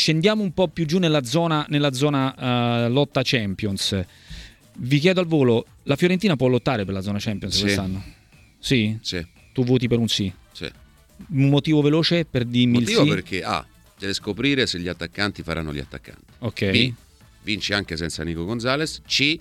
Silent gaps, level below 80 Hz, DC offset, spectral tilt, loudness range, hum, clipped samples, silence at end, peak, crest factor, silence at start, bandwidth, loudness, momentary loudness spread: none; -48 dBFS; under 0.1%; -5.5 dB/octave; 4 LU; none; under 0.1%; 0 s; 0 dBFS; 22 dB; 0 s; 15 kHz; -22 LUFS; 13 LU